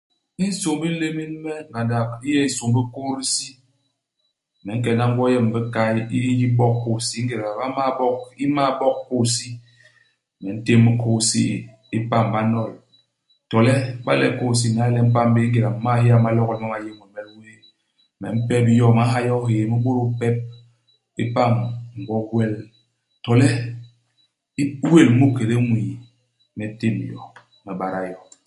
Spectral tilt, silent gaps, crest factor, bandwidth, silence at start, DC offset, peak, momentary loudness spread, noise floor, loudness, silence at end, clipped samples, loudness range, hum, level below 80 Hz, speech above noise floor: -6 dB/octave; none; 20 dB; 11.5 kHz; 0.4 s; under 0.1%; 0 dBFS; 16 LU; -73 dBFS; -20 LUFS; 0.3 s; under 0.1%; 4 LU; none; -56 dBFS; 54 dB